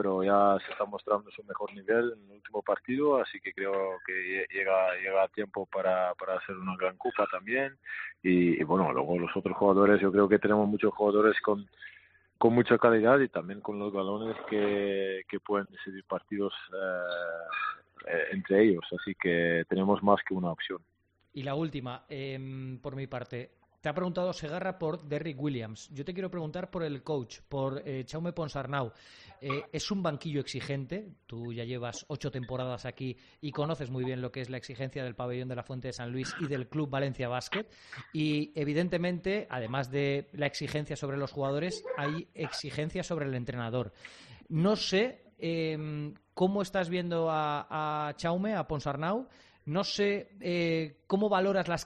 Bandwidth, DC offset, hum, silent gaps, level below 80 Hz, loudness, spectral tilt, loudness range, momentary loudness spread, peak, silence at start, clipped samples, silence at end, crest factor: 9.6 kHz; under 0.1%; none; none; -64 dBFS; -31 LUFS; -6.5 dB/octave; 10 LU; 14 LU; -8 dBFS; 0 s; under 0.1%; 0 s; 24 dB